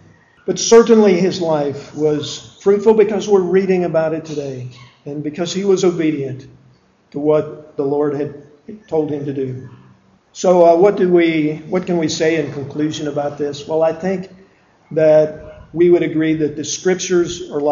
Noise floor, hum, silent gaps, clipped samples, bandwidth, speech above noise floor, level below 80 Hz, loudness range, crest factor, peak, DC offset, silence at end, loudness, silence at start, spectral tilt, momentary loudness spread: -52 dBFS; none; none; under 0.1%; 7.6 kHz; 37 dB; -54 dBFS; 6 LU; 16 dB; 0 dBFS; under 0.1%; 0 s; -16 LUFS; 0.45 s; -5.5 dB/octave; 15 LU